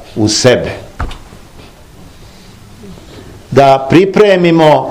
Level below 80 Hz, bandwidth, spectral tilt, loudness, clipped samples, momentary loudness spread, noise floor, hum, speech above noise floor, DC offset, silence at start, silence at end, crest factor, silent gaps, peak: -34 dBFS; 16 kHz; -5 dB/octave; -8 LUFS; 2%; 17 LU; -35 dBFS; none; 28 dB; under 0.1%; 0 s; 0 s; 12 dB; none; 0 dBFS